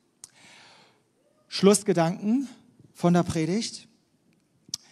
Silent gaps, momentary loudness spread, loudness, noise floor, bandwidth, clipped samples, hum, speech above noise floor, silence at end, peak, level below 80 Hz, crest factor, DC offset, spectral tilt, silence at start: none; 17 LU; -25 LUFS; -66 dBFS; 13 kHz; under 0.1%; none; 43 dB; 0.15 s; -6 dBFS; -62 dBFS; 22 dB; under 0.1%; -5.5 dB/octave; 1.5 s